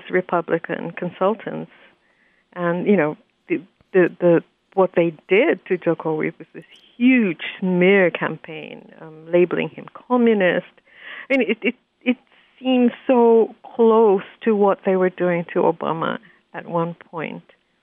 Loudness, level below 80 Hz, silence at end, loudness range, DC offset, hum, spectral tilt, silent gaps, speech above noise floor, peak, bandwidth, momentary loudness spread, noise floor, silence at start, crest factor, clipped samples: -20 LUFS; -74 dBFS; 0.4 s; 5 LU; under 0.1%; none; -9.5 dB/octave; none; 41 dB; -6 dBFS; 3.9 kHz; 16 LU; -61 dBFS; 0.05 s; 14 dB; under 0.1%